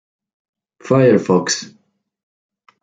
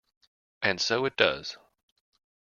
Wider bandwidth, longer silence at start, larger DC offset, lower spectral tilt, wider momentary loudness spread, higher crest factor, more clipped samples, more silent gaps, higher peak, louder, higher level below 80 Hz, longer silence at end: first, 9.4 kHz vs 7.2 kHz; first, 0.85 s vs 0.6 s; neither; first, -5 dB/octave vs -3 dB/octave; second, 8 LU vs 15 LU; second, 18 dB vs 26 dB; neither; neither; first, -2 dBFS vs -6 dBFS; first, -15 LUFS vs -27 LUFS; first, -60 dBFS vs -66 dBFS; first, 1.15 s vs 0.85 s